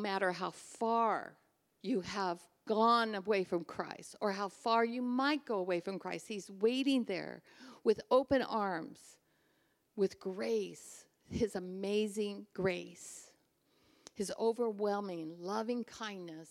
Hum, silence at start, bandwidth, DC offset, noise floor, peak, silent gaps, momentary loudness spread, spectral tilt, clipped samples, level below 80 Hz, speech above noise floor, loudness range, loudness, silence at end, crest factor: none; 0 s; 14.5 kHz; under 0.1%; -75 dBFS; -16 dBFS; none; 16 LU; -5 dB/octave; under 0.1%; -70 dBFS; 40 dB; 5 LU; -36 LUFS; 0 s; 20 dB